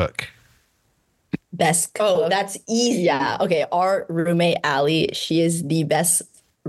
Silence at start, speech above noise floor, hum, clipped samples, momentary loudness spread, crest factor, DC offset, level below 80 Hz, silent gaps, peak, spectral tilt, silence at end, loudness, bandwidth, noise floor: 0 s; 46 dB; none; under 0.1%; 6 LU; 16 dB; under 0.1%; -54 dBFS; none; -6 dBFS; -4 dB/octave; 0 s; -20 LUFS; 13 kHz; -66 dBFS